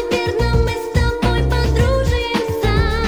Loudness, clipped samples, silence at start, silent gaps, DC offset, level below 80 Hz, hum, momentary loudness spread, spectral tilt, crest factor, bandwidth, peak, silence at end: -18 LUFS; under 0.1%; 0 s; none; 0.4%; -20 dBFS; none; 3 LU; -6 dB/octave; 14 dB; 19 kHz; -2 dBFS; 0 s